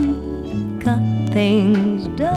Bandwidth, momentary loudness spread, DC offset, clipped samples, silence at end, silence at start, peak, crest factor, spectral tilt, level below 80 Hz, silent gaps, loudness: 10.5 kHz; 10 LU; under 0.1%; under 0.1%; 0 s; 0 s; -6 dBFS; 12 dB; -8 dB/octave; -38 dBFS; none; -19 LUFS